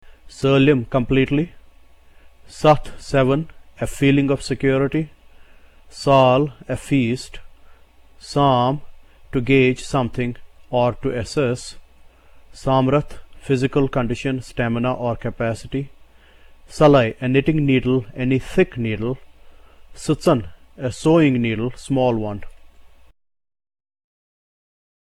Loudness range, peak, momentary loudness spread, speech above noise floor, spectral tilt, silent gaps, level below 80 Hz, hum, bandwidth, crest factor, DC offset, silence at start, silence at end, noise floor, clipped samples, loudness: 4 LU; -2 dBFS; 14 LU; 28 dB; -7 dB/octave; none; -40 dBFS; none; 12.5 kHz; 18 dB; under 0.1%; 0.25 s; 2.15 s; -47 dBFS; under 0.1%; -20 LUFS